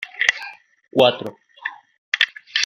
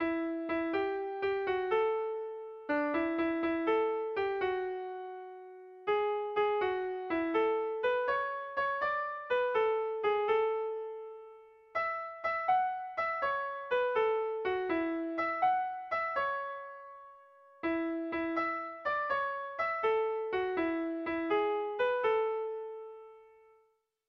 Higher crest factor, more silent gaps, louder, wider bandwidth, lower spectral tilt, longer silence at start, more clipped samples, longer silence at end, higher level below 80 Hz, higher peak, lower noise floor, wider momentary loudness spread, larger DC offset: first, 22 dB vs 14 dB; first, 1.98-2.12 s vs none; first, -19 LUFS vs -33 LUFS; first, 16 kHz vs 6 kHz; second, -2.5 dB/octave vs -6 dB/octave; about the same, 0 s vs 0 s; neither; second, 0 s vs 0.85 s; about the same, -70 dBFS vs -70 dBFS; first, -2 dBFS vs -20 dBFS; second, -39 dBFS vs -73 dBFS; first, 16 LU vs 11 LU; neither